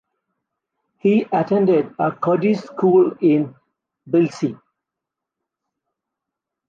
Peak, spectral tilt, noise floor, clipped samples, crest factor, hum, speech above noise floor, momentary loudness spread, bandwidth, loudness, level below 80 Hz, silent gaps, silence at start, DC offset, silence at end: -6 dBFS; -8.5 dB/octave; -84 dBFS; under 0.1%; 16 dB; none; 67 dB; 7 LU; 7.4 kHz; -18 LUFS; -68 dBFS; none; 1.05 s; under 0.1%; 2.15 s